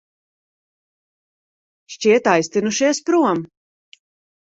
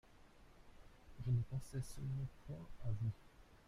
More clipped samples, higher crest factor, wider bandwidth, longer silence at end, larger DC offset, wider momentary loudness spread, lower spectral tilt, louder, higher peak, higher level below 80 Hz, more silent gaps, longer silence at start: neither; about the same, 20 dB vs 18 dB; second, 8.2 kHz vs 12.5 kHz; first, 1.1 s vs 0.1 s; neither; second, 13 LU vs 24 LU; second, -4 dB/octave vs -7.5 dB/octave; first, -18 LUFS vs -45 LUFS; first, 0 dBFS vs -28 dBFS; second, -66 dBFS vs -58 dBFS; neither; first, 1.9 s vs 0.05 s